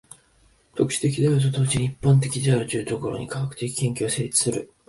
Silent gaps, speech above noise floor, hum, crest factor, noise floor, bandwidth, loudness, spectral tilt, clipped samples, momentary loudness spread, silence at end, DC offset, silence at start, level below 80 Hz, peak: none; 37 dB; none; 16 dB; -59 dBFS; 11.5 kHz; -23 LUFS; -5 dB/octave; under 0.1%; 8 LU; 0.25 s; under 0.1%; 0.75 s; -52 dBFS; -6 dBFS